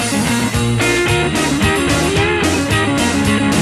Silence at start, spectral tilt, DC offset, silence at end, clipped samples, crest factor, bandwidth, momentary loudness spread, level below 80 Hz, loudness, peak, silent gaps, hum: 0 s; -4.5 dB/octave; under 0.1%; 0 s; under 0.1%; 12 dB; 14 kHz; 2 LU; -30 dBFS; -14 LUFS; -2 dBFS; none; none